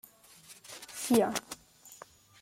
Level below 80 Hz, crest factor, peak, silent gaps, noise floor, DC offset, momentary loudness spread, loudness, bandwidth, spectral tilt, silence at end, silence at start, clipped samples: -70 dBFS; 22 dB; -12 dBFS; none; -56 dBFS; under 0.1%; 25 LU; -31 LUFS; 16.5 kHz; -3.5 dB/octave; 0.45 s; 0.5 s; under 0.1%